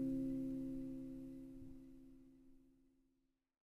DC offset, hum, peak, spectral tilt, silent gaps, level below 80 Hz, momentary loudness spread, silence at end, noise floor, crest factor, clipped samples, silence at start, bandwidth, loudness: under 0.1%; none; -32 dBFS; -9 dB/octave; none; -64 dBFS; 22 LU; 1 s; -84 dBFS; 16 dB; under 0.1%; 0 s; 11.5 kHz; -47 LUFS